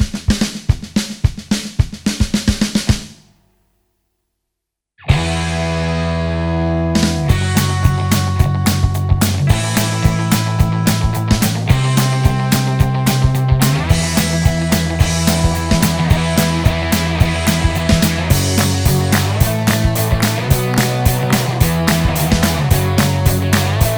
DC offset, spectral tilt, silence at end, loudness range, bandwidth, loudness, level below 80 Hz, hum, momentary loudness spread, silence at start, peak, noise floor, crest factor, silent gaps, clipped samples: under 0.1%; -5 dB/octave; 0 s; 6 LU; over 20 kHz; -15 LUFS; -24 dBFS; none; 4 LU; 0 s; 0 dBFS; -79 dBFS; 14 dB; none; under 0.1%